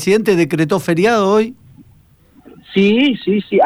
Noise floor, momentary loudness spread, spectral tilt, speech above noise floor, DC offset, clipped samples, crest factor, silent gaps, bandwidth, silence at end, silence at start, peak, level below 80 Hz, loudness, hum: -49 dBFS; 5 LU; -6 dB/octave; 35 dB; under 0.1%; under 0.1%; 12 dB; none; over 20 kHz; 0 s; 0 s; -4 dBFS; -54 dBFS; -14 LUFS; none